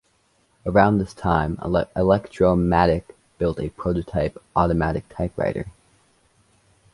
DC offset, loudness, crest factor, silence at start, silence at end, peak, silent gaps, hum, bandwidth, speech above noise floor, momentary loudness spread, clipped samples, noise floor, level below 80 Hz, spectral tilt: under 0.1%; -22 LUFS; 20 dB; 0.65 s; 1.25 s; -2 dBFS; none; none; 11.5 kHz; 43 dB; 9 LU; under 0.1%; -64 dBFS; -38 dBFS; -8.5 dB/octave